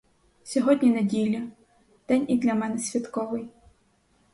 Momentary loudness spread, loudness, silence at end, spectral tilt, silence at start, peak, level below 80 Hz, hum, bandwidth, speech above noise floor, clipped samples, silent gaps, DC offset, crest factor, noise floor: 12 LU; -25 LUFS; 0.85 s; -5.5 dB/octave; 0.45 s; -8 dBFS; -64 dBFS; none; 11.5 kHz; 41 dB; under 0.1%; none; under 0.1%; 18 dB; -65 dBFS